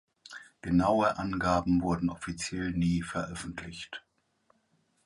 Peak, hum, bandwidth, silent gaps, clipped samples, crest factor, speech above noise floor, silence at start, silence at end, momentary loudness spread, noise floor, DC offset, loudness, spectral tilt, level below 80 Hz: -14 dBFS; none; 11.5 kHz; none; under 0.1%; 18 dB; 42 dB; 0.3 s; 1.05 s; 17 LU; -72 dBFS; under 0.1%; -30 LUFS; -6 dB/octave; -50 dBFS